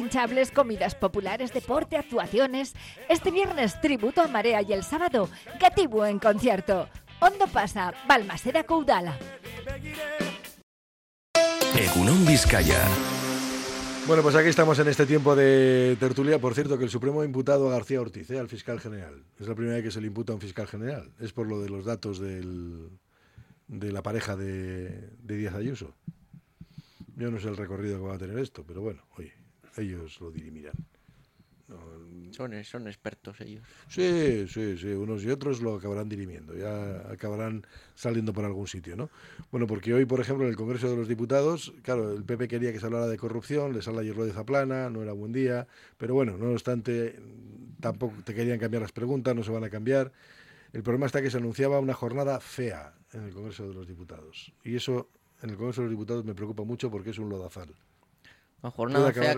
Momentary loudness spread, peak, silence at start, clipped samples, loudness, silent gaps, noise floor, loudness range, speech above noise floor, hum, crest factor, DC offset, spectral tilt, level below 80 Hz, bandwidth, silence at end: 20 LU; -6 dBFS; 0 s; under 0.1%; -27 LUFS; 10.63-11.34 s; -62 dBFS; 15 LU; 34 dB; none; 22 dB; under 0.1%; -5.5 dB/octave; -46 dBFS; 16.5 kHz; 0 s